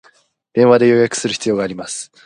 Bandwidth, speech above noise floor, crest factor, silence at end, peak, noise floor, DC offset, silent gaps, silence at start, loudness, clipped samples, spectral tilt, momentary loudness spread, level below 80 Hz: 11 kHz; 39 dB; 16 dB; 0.2 s; 0 dBFS; -54 dBFS; under 0.1%; none; 0.55 s; -15 LUFS; under 0.1%; -4.5 dB/octave; 13 LU; -58 dBFS